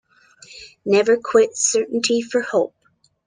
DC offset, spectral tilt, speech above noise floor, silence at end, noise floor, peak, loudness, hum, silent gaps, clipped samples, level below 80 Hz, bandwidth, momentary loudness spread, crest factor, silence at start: under 0.1%; -2.5 dB/octave; 30 dB; 0.6 s; -48 dBFS; -4 dBFS; -19 LUFS; none; none; under 0.1%; -66 dBFS; 10 kHz; 14 LU; 18 dB; 0.5 s